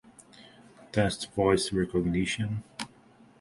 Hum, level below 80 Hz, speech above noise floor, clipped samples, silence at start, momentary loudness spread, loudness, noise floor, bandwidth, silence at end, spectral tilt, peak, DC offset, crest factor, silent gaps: none; -50 dBFS; 30 dB; under 0.1%; 0.4 s; 14 LU; -29 LUFS; -57 dBFS; 11.5 kHz; 0.55 s; -5.5 dB/octave; -10 dBFS; under 0.1%; 20 dB; none